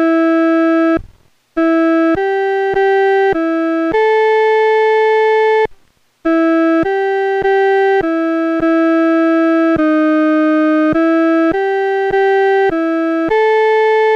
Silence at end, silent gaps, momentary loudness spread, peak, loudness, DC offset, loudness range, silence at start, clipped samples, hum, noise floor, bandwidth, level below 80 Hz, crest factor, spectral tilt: 0 s; none; 4 LU; -6 dBFS; -13 LUFS; under 0.1%; 1 LU; 0 s; under 0.1%; none; -52 dBFS; 6.6 kHz; -46 dBFS; 8 dB; -6.5 dB/octave